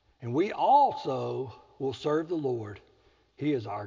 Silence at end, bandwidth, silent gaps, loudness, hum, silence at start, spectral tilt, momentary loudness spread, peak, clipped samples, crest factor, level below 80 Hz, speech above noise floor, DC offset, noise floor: 0 s; 7.6 kHz; none; -29 LUFS; none; 0.2 s; -7.5 dB/octave; 14 LU; -12 dBFS; under 0.1%; 18 dB; -66 dBFS; 36 dB; under 0.1%; -64 dBFS